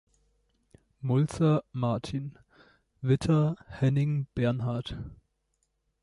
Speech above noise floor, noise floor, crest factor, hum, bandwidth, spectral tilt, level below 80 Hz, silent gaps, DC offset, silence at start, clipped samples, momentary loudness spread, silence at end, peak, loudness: 49 dB; -77 dBFS; 16 dB; none; 11.5 kHz; -8 dB/octave; -54 dBFS; none; under 0.1%; 1 s; under 0.1%; 13 LU; 0.9 s; -12 dBFS; -29 LUFS